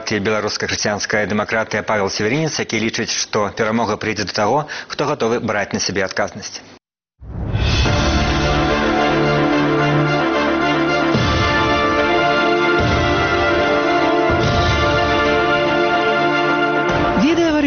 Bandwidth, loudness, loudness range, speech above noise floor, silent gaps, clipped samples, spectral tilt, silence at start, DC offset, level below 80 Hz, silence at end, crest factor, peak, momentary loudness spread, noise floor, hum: 6.8 kHz; -17 LUFS; 5 LU; 25 dB; none; under 0.1%; -4 dB/octave; 0 s; under 0.1%; -30 dBFS; 0 s; 14 dB; -2 dBFS; 5 LU; -44 dBFS; none